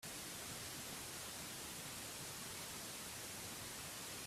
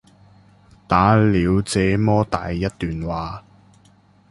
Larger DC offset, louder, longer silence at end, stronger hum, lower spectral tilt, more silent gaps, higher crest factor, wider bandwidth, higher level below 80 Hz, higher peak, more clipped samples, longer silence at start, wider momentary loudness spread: neither; second, -47 LUFS vs -19 LUFS; second, 0 s vs 0.9 s; neither; second, -1.5 dB/octave vs -6.5 dB/octave; neither; about the same, 14 dB vs 18 dB; first, 16 kHz vs 11.5 kHz; second, -70 dBFS vs -38 dBFS; second, -36 dBFS vs -2 dBFS; neither; second, 0 s vs 0.9 s; second, 0 LU vs 12 LU